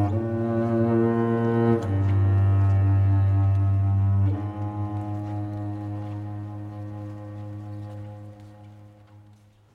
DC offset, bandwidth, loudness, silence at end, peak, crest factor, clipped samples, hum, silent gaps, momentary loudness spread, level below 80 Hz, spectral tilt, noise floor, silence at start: under 0.1%; 3.2 kHz; -24 LUFS; 0.55 s; -8 dBFS; 14 dB; under 0.1%; none; none; 16 LU; -54 dBFS; -10.5 dB/octave; -54 dBFS; 0 s